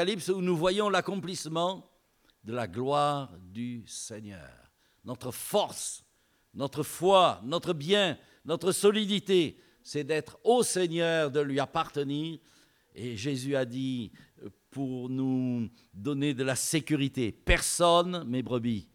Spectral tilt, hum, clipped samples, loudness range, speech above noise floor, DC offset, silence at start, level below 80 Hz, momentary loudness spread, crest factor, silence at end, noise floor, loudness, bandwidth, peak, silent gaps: -4.5 dB/octave; none; under 0.1%; 7 LU; 39 dB; under 0.1%; 0 s; -48 dBFS; 16 LU; 22 dB; 0.1 s; -68 dBFS; -29 LUFS; 18 kHz; -8 dBFS; none